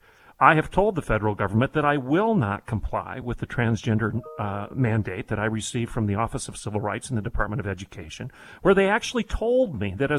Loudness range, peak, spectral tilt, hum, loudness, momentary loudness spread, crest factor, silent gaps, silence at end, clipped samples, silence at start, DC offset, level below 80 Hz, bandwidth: 5 LU; -2 dBFS; -6 dB/octave; none; -24 LUFS; 11 LU; 24 dB; none; 0 s; under 0.1%; 0.4 s; under 0.1%; -40 dBFS; 12 kHz